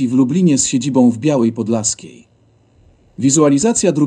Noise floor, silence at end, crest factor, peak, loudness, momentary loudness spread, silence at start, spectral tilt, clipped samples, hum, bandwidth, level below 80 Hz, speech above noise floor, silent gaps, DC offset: -53 dBFS; 0 s; 14 dB; 0 dBFS; -14 LUFS; 6 LU; 0 s; -5 dB/octave; under 0.1%; none; 11 kHz; -52 dBFS; 39 dB; none; under 0.1%